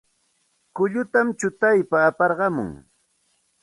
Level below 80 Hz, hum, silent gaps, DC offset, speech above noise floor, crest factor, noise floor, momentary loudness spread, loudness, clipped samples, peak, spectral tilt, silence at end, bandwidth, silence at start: -60 dBFS; none; none; under 0.1%; 47 dB; 18 dB; -68 dBFS; 10 LU; -21 LUFS; under 0.1%; -4 dBFS; -6.5 dB/octave; 0.85 s; 11.5 kHz; 0.75 s